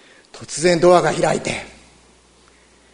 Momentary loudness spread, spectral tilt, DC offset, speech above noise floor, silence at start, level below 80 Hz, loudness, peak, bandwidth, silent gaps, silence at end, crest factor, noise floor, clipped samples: 21 LU; -4.5 dB/octave; under 0.1%; 36 dB; 0.35 s; -48 dBFS; -17 LUFS; 0 dBFS; 11 kHz; none; 1.25 s; 20 dB; -52 dBFS; under 0.1%